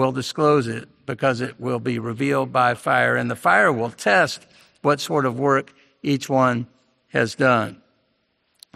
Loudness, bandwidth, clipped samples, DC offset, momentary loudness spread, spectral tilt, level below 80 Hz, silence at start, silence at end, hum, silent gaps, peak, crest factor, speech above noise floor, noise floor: -21 LUFS; 14.5 kHz; under 0.1%; under 0.1%; 10 LU; -5.5 dB/octave; -64 dBFS; 0 s; 1 s; none; none; -2 dBFS; 18 dB; 48 dB; -69 dBFS